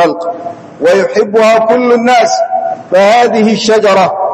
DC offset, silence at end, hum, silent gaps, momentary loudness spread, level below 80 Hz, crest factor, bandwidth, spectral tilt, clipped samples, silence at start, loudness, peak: under 0.1%; 0 s; none; none; 9 LU; -56 dBFS; 8 dB; 12.5 kHz; -4.5 dB/octave; 2%; 0 s; -9 LUFS; 0 dBFS